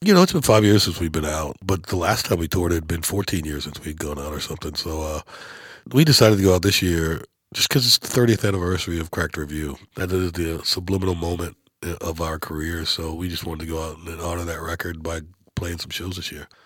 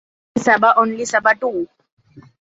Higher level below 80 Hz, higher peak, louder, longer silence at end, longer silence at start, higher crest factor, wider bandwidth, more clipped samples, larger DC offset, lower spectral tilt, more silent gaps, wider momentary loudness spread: first, -38 dBFS vs -62 dBFS; about the same, 0 dBFS vs -2 dBFS; second, -22 LUFS vs -16 LUFS; about the same, 0.2 s vs 0.25 s; second, 0 s vs 0.35 s; first, 22 dB vs 16 dB; first, 18 kHz vs 8 kHz; neither; neither; about the same, -4.5 dB/octave vs -4 dB/octave; second, none vs 1.92-1.97 s; about the same, 16 LU vs 14 LU